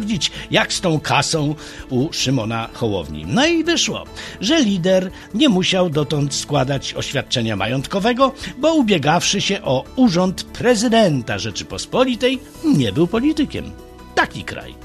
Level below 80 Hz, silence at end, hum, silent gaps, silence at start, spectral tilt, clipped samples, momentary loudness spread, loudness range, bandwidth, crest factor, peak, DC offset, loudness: -42 dBFS; 0 s; none; none; 0 s; -4.5 dB/octave; under 0.1%; 8 LU; 3 LU; 13.5 kHz; 18 dB; 0 dBFS; under 0.1%; -18 LUFS